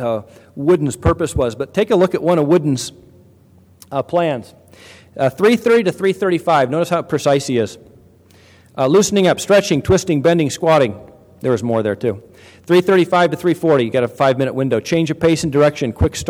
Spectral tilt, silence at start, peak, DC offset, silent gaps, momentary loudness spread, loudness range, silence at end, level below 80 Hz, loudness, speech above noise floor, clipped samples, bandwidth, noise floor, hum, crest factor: -5.5 dB/octave; 0 s; 0 dBFS; under 0.1%; none; 9 LU; 3 LU; 0 s; -40 dBFS; -16 LUFS; 33 dB; under 0.1%; 16 kHz; -48 dBFS; none; 16 dB